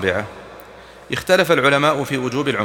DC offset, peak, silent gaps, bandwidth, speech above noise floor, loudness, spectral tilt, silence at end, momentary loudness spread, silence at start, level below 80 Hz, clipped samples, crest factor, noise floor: under 0.1%; -2 dBFS; none; 19.5 kHz; 23 dB; -17 LUFS; -4.5 dB/octave; 0 s; 20 LU; 0 s; -52 dBFS; under 0.1%; 18 dB; -40 dBFS